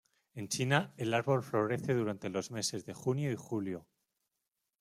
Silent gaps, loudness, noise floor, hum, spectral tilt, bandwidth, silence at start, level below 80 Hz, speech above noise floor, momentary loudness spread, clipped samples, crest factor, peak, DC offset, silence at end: none; -34 LUFS; -87 dBFS; none; -5 dB/octave; 15 kHz; 0.35 s; -74 dBFS; 53 dB; 8 LU; under 0.1%; 22 dB; -12 dBFS; under 0.1%; 1 s